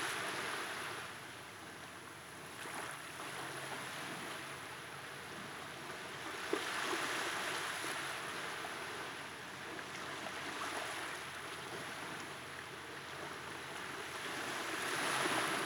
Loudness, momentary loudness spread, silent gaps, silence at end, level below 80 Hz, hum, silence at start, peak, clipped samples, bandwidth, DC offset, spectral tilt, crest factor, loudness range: -42 LUFS; 10 LU; none; 0 s; -82 dBFS; none; 0 s; -22 dBFS; under 0.1%; over 20 kHz; under 0.1%; -2 dB/octave; 22 dB; 5 LU